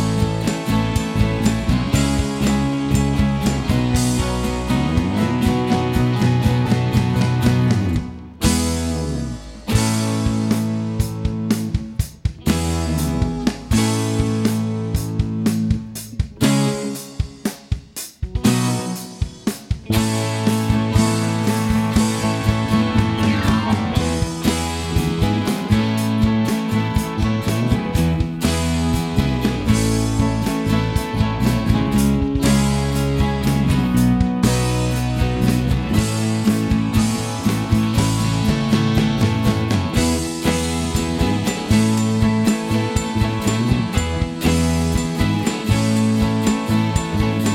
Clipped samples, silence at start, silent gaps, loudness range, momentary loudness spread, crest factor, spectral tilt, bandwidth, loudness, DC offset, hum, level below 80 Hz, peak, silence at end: under 0.1%; 0 s; none; 3 LU; 5 LU; 16 dB; -5.5 dB/octave; 17 kHz; -19 LUFS; under 0.1%; none; -30 dBFS; -2 dBFS; 0 s